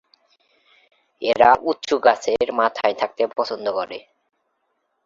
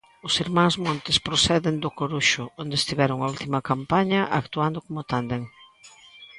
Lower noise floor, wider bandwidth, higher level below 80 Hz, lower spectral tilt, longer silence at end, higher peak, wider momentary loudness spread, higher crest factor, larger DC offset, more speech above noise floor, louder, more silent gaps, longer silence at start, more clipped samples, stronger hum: first, -72 dBFS vs -51 dBFS; second, 7.6 kHz vs 11.5 kHz; second, -60 dBFS vs -52 dBFS; about the same, -3.5 dB/octave vs -4 dB/octave; first, 1.05 s vs 0 s; first, -2 dBFS vs -6 dBFS; first, 12 LU vs 8 LU; about the same, 20 dB vs 18 dB; neither; first, 52 dB vs 26 dB; first, -20 LUFS vs -24 LUFS; neither; first, 1.2 s vs 0.25 s; neither; neither